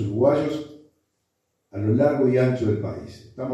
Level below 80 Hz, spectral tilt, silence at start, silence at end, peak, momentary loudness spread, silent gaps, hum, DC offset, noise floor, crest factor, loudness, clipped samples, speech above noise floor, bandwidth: -58 dBFS; -9 dB/octave; 0 s; 0 s; -6 dBFS; 18 LU; none; none; under 0.1%; -75 dBFS; 16 dB; -22 LUFS; under 0.1%; 53 dB; 8.6 kHz